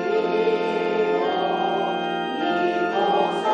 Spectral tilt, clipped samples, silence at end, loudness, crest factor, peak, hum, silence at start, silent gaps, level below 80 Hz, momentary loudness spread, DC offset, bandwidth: -6 dB/octave; under 0.1%; 0 s; -22 LUFS; 12 dB; -10 dBFS; none; 0 s; none; -72 dBFS; 3 LU; under 0.1%; 9.2 kHz